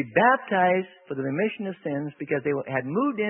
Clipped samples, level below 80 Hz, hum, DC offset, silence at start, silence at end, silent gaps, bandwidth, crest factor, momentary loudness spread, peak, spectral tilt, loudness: under 0.1%; -72 dBFS; none; under 0.1%; 0 s; 0 s; none; 3.6 kHz; 20 dB; 11 LU; -6 dBFS; -11 dB/octave; -25 LUFS